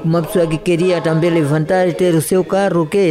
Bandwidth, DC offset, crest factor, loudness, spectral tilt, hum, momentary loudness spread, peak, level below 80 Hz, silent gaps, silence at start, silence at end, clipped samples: 15.5 kHz; under 0.1%; 10 dB; -15 LUFS; -6.5 dB/octave; none; 2 LU; -4 dBFS; -44 dBFS; none; 0 s; 0 s; under 0.1%